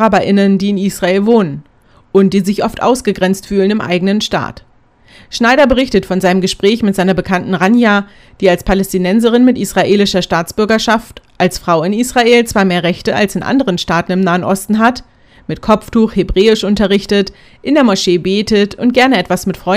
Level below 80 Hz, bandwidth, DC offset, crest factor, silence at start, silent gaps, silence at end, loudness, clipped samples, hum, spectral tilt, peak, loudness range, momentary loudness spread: -34 dBFS; 16 kHz; under 0.1%; 12 dB; 0 s; none; 0 s; -12 LUFS; 0.4%; none; -5.5 dB/octave; 0 dBFS; 2 LU; 6 LU